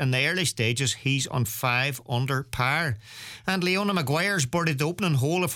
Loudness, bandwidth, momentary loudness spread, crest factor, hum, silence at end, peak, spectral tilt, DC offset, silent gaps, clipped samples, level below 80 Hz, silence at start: -25 LUFS; 18.5 kHz; 5 LU; 16 dB; none; 0 s; -8 dBFS; -4 dB/octave; under 0.1%; none; under 0.1%; -56 dBFS; 0 s